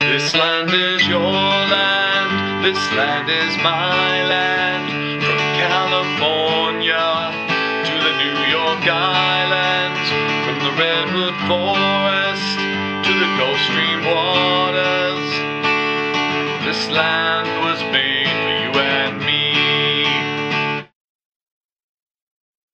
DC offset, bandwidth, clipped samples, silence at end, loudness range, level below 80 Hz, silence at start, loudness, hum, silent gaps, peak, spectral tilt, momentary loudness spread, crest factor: under 0.1%; 9.2 kHz; under 0.1%; 1.9 s; 2 LU; -62 dBFS; 0 s; -16 LUFS; none; none; -2 dBFS; -4 dB/octave; 4 LU; 18 dB